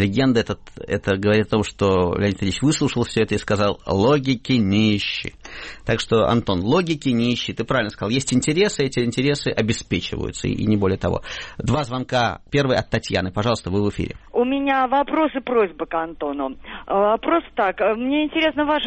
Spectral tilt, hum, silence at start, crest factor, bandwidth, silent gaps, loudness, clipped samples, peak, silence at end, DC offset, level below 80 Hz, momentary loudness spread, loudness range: -5.5 dB/octave; none; 0 s; 14 dB; 8.8 kHz; none; -21 LUFS; under 0.1%; -6 dBFS; 0 s; under 0.1%; -42 dBFS; 8 LU; 2 LU